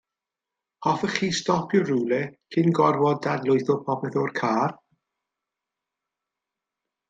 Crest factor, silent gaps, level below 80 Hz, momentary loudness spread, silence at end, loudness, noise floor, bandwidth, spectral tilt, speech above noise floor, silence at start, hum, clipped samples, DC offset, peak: 20 dB; none; -68 dBFS; 7 LU; 2.35 s; -24 LUFS; -88 dBFS; 9.2 kHz; -6 dB/octave; 65 dB; 0.8 s; none; under 0.1%; under 0.1%; -6 dBFS